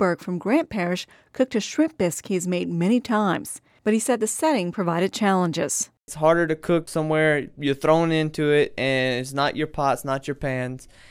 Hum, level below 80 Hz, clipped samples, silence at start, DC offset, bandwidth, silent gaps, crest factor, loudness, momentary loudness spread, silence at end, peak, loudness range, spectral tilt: none; -54 dBFS; under 0.1%; 0 s; under 0.1%; 16.5 kHz; none; 18 dB; -23 LUFS; 7 LU; 0.25 s; -4 dBFS; 2 LU; -5 dB/octave